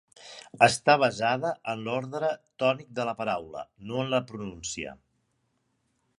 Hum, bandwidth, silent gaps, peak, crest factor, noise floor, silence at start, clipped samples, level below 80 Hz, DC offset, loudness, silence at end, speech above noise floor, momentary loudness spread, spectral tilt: none; 11.5 kHz; none; -4 dBFS; 26 dB; -74 dBFS; 0.2 s; under 0.1%; -64 dBFS; under 0.1%; -27 LUFS; 1.25 s; 47 dB; 18 LU; -4 dB/octave